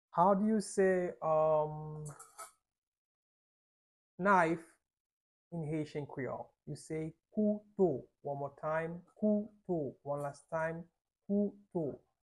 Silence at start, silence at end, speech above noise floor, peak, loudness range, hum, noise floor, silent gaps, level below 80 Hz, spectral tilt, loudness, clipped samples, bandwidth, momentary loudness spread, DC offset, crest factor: 0.15 s; 0.3 s; over 56 dB; -14 dBFS; 3 LU; none; under -90 dBFS; 2.78-2.92 s, 2.98-4.18 s, 5.00-5.51 s; -72 dBFS; -7 dB/octave; -35 LUFS; under 0.1%; 12 kHz; 17 LU; under 0.1%; 22 dB